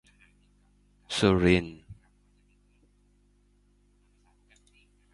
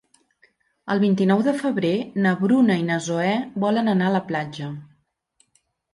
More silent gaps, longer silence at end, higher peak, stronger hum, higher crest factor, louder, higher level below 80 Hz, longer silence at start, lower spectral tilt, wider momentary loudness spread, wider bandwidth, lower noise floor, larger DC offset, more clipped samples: neither; first, 3.2 s vs 1.1 s; about the same, -8 dBFS vs -8 dBFS; first, 50 Hz at -60 dBFS vs none; first, 26 dB vs 14 dB; second, -25 LUFS vs -21 LUFS; first, -48 dBFS vs -66 dBFS; first, 1.1 s vs 0.85 s; about the same, -6 dB/octave vs -6.5 dB/octave; first, 22 LU vs 12 LU; about the same, 11.5 kHz vs 11.5 kHz; about the same, -65 dBFS vs -67 dBFS; neither; neither